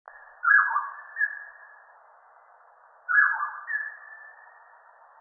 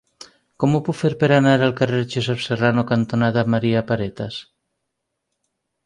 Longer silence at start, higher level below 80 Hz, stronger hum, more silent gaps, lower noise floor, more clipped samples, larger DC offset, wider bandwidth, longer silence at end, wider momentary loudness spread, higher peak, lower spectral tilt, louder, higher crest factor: second, 0.45 s vs 0.6 s; second, -88 dBFS vs -54 dBFS; neither; neither; second, -56 dBFS vs -77 dBFS; neither; neither; second, 2.1 kHz vs 11 kHz; second, 0.9 s vs 1.45 s; first, 24 LU vs 8 LU; second, -8 dBFS vs -4 dBFS; second, -1.5 dB/octave vs -7 dB/octave; second, -24 LUFS vs -19 LUFS; about the same, 20 dB vs 18 dB